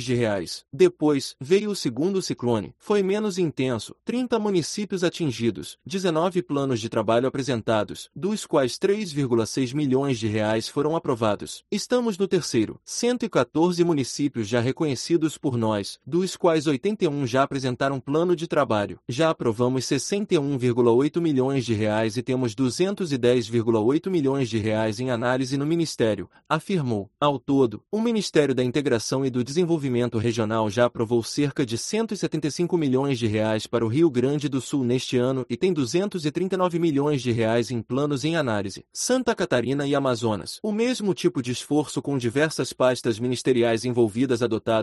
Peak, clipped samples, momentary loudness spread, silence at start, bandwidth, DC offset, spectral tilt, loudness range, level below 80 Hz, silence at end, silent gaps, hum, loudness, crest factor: -6 dBFS; under 0.1%; 5 LU; 0 s; 12 kHz; under 0.1%; -5.5 dB/octave; 2 LU; -60 dBFS; 0 s; none; none; -24 LUFS; 18 dB